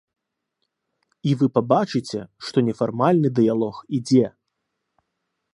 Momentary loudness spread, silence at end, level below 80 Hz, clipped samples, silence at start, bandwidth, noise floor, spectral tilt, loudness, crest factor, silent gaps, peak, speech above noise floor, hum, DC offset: 10 LU; 1.25 s; -64 dBFS; under 0.1%; 1.25 s; 11 kHz; -78 dBFS; -7.5 dB/octave; -21 LUFS; 20 dB; none; -2 dBFS; 58 dB; none; under 0.1%